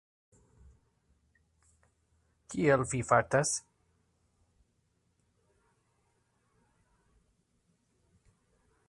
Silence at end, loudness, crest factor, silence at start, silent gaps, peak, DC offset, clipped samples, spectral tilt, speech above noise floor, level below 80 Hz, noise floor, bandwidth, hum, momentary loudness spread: 5.3 s; -29 LUFS; 28 dB; 2.5 s; none; -10 dBFS; under 0.1%; under 0.1%; -4.5 dB/octave; 47 dB; -64 dBFS; -75 dBFS; 11.5 kHz; none; 9 LU